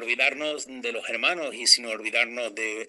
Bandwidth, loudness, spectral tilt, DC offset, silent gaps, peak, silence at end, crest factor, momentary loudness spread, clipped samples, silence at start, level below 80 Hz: 13 kHz; -24 LUFS; 1 dB/octave; under 0.1%; none; -4 dBFS; 0 s; 24 dB; 12 LU; under 0.1%; 0 s; -78 dBFS